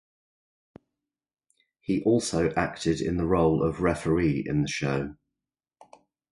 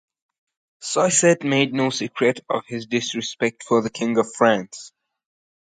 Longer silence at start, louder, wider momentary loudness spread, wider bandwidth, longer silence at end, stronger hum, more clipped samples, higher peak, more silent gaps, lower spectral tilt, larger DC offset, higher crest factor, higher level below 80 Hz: first, 1.9 s vs 0.8 s; second, -26 LUFS vs -21 LUFS; second, 6 LU vs 10 LU; first, 11.5 kHz vs 9.6 kHz; first, 1.2 s vs 0.9 s; neither; neither; second, -10 dBFS vs -2 dBFS; neither; first, -6 dB/octave vs -3.5 dB/octave; neither; about the same, 18 dB vs 20 dB; first, -46 dBFS vs -66 dBFS